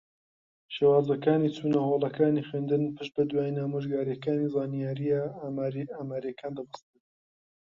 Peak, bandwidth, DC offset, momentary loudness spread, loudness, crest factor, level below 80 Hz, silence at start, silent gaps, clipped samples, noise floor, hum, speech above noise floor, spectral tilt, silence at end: -12 dBFS; 7.2 kHz; under 0.1%; 12 LU; -29 LUFS; 18 dB; -70 dBFS; 0.7 s; none; under 0.1%; under -90 dBFS; none; over 62 dB; -9 dB/octave; 1 s